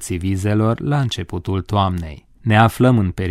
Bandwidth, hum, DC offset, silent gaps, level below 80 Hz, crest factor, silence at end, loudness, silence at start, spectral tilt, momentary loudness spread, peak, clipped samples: 15 kHz; none; under 0.1%; none; -40 dBFS; 18 dB; 0 s; -18 LUFS; 0 s; -6.5 dB/octave; 11 LU; 0 dBFS; under 0.1%